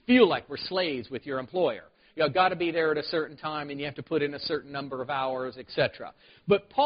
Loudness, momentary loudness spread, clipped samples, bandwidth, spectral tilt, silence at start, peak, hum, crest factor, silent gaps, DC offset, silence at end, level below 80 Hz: -28 LUFS; 11 LU; under 0.1%; 5.4 kHz; -3 dB/octave; 0.1 s; -8 dBFS; none; 20 dB; none; under 0.1%; 0 s; -64 dBFS